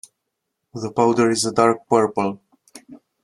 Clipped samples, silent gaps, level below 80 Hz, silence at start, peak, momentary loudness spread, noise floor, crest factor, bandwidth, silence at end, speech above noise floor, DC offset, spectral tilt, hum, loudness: under 0.1%; none; -62 dBFS; 0.75 s; -2 dBFS; 15 LU; -78 dBFS; 20 dB; 12.5 kHz; 0.3 s; 60 dB; under 0.1%; -4.5 dB/octave; none; -19 LUFS